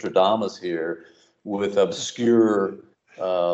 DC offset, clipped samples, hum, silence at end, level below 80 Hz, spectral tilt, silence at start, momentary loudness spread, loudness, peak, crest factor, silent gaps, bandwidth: under 0.1%; under 0.1%; none; 0 s; -72 dBFS; -5 dB/octave; 0 s; 13 LU; -23 LUFS; -6 dBFS; 16 dB; none; 8.2 kHz